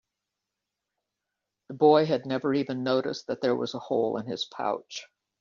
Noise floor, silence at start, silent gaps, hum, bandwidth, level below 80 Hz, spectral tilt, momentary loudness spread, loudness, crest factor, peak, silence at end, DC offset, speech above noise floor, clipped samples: -86 dBFS; 1.7 s; none; none; 7.4 kHz; -74 dBFS; -4.5 dB/octave; 13 LU; -27 LUFS; 20 dB; -8 dBFS; 0.35 s; under 0.1%; 59 dB; under 0.1%